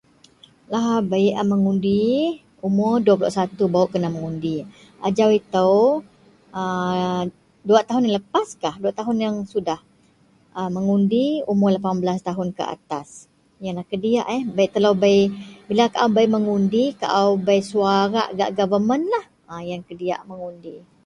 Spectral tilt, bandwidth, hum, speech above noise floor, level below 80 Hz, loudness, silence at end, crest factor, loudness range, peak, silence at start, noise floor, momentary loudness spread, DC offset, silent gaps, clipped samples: -6.5 dB/octave; 10.5 kHz; none; 37 dB; -60 dBFS; -21 LUFS; 0.3 s; 18 dB; 4 LU; -2 dBFS; 0.7 s; -57 dBFS; 13 LU; under 0.1%; none; under 0.1%